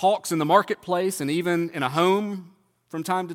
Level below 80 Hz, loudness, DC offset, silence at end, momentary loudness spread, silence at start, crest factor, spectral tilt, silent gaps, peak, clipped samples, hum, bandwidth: -74 dBFS; -24 LUFS; under 0.1%; 0 s; 13 LU; 0 s; 20 dB; -5 dB/octave; none; -4 dBFS; under 0.1%; none; 17.5 kHz